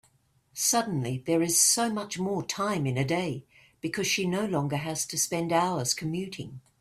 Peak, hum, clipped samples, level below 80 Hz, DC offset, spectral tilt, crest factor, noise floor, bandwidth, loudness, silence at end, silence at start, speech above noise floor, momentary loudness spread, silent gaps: -10 dBFS; none; under 0.1%; -64 dBFS; under 0.1%; -3.5 dB/octave; 18 dB; -66 dBFS; 16 kHz; -27 LUFS; 0.2 s; 0.55 s; 38 dB; 13 LU; none